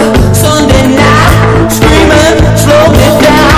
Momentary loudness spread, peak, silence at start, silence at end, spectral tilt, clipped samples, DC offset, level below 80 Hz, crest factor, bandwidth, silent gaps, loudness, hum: 2 LU; 0 dBFS; 0 s; 0 s; -5 dB/octave; 6%; under 0.1%; -14 dBFS; 4 dB; 16 kHz; none; -5 LUFS; none